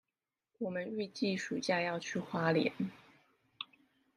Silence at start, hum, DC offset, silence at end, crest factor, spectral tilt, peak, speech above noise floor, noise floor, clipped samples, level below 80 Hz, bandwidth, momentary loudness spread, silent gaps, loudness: 0.6 s; none; under 0.1%; 0.5 s; 22 dB; -5 dB/octave; -16 dBFS; over 55 dB; under -90 dBFS; under 0.1%; -80 dBFS; 11 kHz; 15 LU; none; -36 LUFS